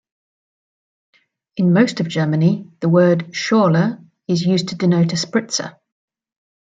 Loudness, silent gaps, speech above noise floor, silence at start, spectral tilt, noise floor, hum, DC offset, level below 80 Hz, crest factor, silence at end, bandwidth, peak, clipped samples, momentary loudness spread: -17 LUFS; none; over 74 dB; 1.55 s; -6 dB/octave; under -90 dBFS; none; under 0.1%; -62 dBFS; 16 dB; 0.95 s; 7.8 kHz; -2 dBFS; under 0.1%; 9 LU